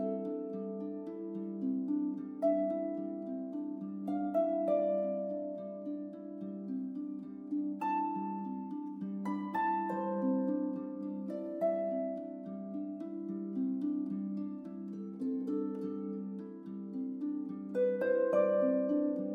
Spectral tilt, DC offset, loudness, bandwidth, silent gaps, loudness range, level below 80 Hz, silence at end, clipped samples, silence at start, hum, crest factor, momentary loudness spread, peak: -10 dB/octave; under 0.1%; -36 LUFS; 4.7 kHz; none; 4 LU; -86 dBFS; 0 s; under 0.1%; 0 s; none; 18 dB; 11 LU; -18 dBFS